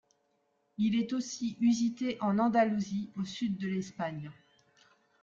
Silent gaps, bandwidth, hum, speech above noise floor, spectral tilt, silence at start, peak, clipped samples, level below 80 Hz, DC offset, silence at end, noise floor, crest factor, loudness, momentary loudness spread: none; 7.6 kHz; none; 44 dB; -6 dB/octave; 0.8 s; -14 dBFS; under 0.1%; -72 dBFS; under 0.1%; 0.9 s; -75 dBFS; 18 dB; -32 LUFS; 11 LU